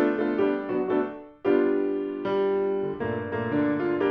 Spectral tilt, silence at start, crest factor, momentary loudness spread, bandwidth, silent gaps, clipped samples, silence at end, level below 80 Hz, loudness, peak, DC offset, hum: -9.5 dB/octave; 0 s; 14 dB; 6 LU; 5.2 kHz; none; under 0.1%; 0 s; -62 dBFS; -26 LUFS; -10 dBFS; under 0.1%; none